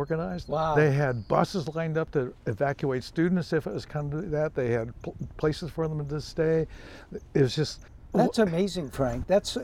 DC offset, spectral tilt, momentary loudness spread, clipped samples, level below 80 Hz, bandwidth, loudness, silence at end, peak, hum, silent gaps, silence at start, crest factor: under 0.1%; -6.5 dB/octave; 9 LU; under 0.1%; -48 dBFS; 14.5 kHz; -28 LUFS; 0 s; -8 dBFS; none; none; 0 s; 18 dB